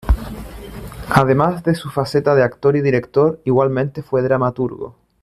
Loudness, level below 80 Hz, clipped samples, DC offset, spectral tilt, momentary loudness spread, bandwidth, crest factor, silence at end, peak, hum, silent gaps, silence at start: -17 LUFS; -30 dBFS; under 0.1%; under 0.1%; -7.5 dB/octave; 18 LU; 14.5 kHz; 16 dB; 0.3 s; -2 dBFS; none; none; 0.05 s